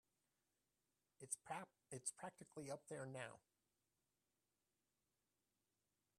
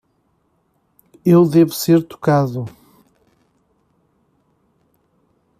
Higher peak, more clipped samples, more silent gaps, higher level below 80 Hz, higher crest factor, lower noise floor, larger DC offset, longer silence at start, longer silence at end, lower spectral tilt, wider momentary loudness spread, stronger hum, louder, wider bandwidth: second, -30 dBFS vs -2 dBFS; neither; neither; second, under -90 dBFS vs -60 dBFS; first, 28 dB vs 16 dB; first, under -90 dBFS vs -64 dBFS; neither; about the same, 1.2 s vs 1.25 s; about the same, 2.8 s vs 2.9 s; second, -3.5 dB/octave vs -7 dB/octave; second, 8 LU vs 13 LU; neither; second, -53 LUFS vs -15 LUFS; about the same, 14 kHz vs 15 kHz